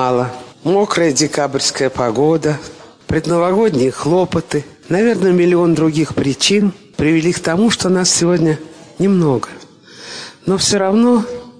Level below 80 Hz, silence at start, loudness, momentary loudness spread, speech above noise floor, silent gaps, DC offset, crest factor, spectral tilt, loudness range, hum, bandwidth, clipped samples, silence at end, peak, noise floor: -46 dBFS; 0 s; -15 LUFS; 10 LU; 22 dB; none; under 0.1%; 14 dB; -4.5 dB/octave; 2 LU; none; 10.5 kHz; under 0.1%; 0.1 s; -2 dBFS; -36 dBFS